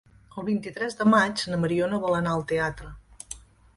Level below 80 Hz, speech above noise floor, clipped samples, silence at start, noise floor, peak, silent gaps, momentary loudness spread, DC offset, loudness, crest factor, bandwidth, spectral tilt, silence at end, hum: -52 dBFS; 20 dB; under 0.1%; 0.35 s; -45 dBFS; -8 dBFS; none; 21 LU; under 0.1%; -25 LUFS; 20 dB; 11.5 kHz; -5.5 dB/octave; 0.35 s; none